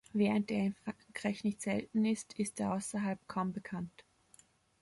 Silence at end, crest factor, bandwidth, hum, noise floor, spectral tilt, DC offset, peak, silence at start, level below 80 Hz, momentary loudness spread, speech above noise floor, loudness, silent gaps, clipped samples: 0.8 s; 18 dB; 11.5 kHz; none; -66 dBFS; -5.5 dB/octave; under 0.1%; -20 dBFS; 0.15 s; -70 dBFS; 11 LU; 31 dB; -36 LUFS; none; under 0.1%